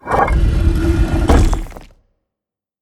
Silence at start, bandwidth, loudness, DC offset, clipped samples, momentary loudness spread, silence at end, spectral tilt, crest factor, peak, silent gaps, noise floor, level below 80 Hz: 0.05 s; 12.5 kHz; -16 LUFS; under 0.1%; under 0.1%; 8 LU; 0.95 s; -7 dB/octave; 16 dB; 0 dBFS; none; -85 dBFS; -18 dBFS